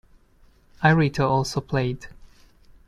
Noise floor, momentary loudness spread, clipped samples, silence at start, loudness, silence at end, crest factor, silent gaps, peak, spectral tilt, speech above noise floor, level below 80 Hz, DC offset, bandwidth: -56 dBFS; 9 LU; under 0.1%; 0.8 s; -22 LUFS; 0.75 s; 20 dB; none; -6 dBFS; -6.5 dB/octave; 35 dB; -48 dBFS; under 0.1%; 12.5 kHz